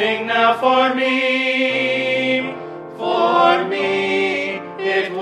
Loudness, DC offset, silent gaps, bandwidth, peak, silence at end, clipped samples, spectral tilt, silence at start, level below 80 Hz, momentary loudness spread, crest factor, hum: -17 LUFS; under 0.1%; none; 11 kHz; 0 dBFS; 0 s; under 0.1%; -4.5 dB/octave; 0 s; -68 dBFS; 10 LU; 16 dB; none